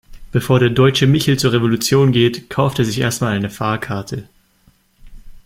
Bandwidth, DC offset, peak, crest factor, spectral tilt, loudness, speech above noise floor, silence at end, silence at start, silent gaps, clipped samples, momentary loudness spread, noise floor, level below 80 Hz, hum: 16 kHz; under 0.1%; -2 dBFS; 16 dB; -5.5 dB/octave; -16 LUFS; 40 dB; 0.1 s; 0.1 s; none; under 0.1%; 10 LU; -55 dBFS; -44 dBFS; none